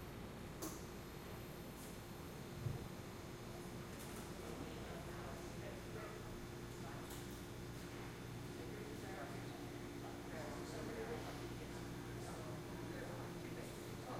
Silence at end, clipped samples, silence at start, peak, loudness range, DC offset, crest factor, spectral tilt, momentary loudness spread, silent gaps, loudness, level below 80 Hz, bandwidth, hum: 0 s; under 0.1%; 0 s; -32 dBFS; 2 LU; under 0.1%; 18 dB; -5 dB/octave; 4 LU; none; -50 LUFS; -62 dBFS; 16.5 kHz; none